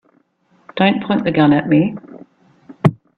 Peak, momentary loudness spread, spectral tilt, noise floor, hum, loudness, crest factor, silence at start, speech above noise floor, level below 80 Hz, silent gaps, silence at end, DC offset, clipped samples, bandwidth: 0 dBFS; 11 LU; -9 dB/octave; -58 dBFS; none; -16 LUFS; 18 dB; 0.75 s; 44 dB; -52 dBFS; none; 0.25 s; under 0.1%; under 0.1%; 4.9 kHz